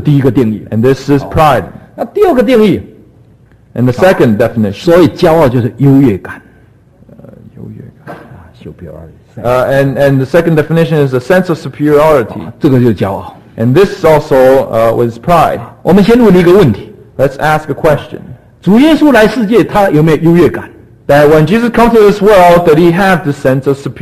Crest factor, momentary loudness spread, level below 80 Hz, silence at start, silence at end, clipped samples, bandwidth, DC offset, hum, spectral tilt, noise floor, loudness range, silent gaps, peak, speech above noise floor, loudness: 8 dB; 14 LU; -34 dBFS; 0 s; 0 s; 0.9%; 14.5 kHz; 0.3%; none; -7.5 dB/octave; -42 dBFS; 6 LU; none; 0 dBFS; 34 dB; -8 LUFS